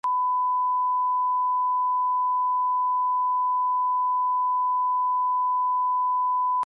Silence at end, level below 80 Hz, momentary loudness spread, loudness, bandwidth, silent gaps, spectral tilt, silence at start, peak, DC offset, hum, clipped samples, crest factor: 0 s; -88 dBFS; 0 LU; -23 LUFS; 2.1 kHz; none; -2 dB/octave; 0.05 s; -20 dBFS; under 0.1%; 50 Hz at -105 dBFS; under 0.1%; 4 dB